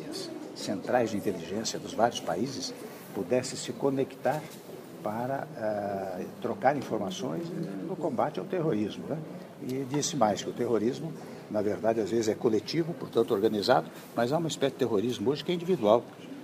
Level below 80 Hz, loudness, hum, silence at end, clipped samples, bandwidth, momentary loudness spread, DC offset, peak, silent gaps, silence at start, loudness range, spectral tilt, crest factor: -72 dBFS; -30 LUFS; none; 0 s; under 0.1%; 15.5 kHz; 11 LU; under 0.1%; -8 dBFS; none; 0 s; 4 LU; -5 dB/octave; 22 dB